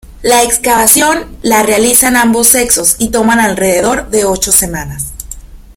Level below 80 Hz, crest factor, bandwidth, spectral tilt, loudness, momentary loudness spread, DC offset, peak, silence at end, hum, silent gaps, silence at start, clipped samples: -32 dBFS; 10 dB; over 20 kHz; -2 dB/octave; -8 LUFS; 12 LU; under 0.1%; 0 dBFS; 0.05 s; none; none; 0.1 s; 0.6%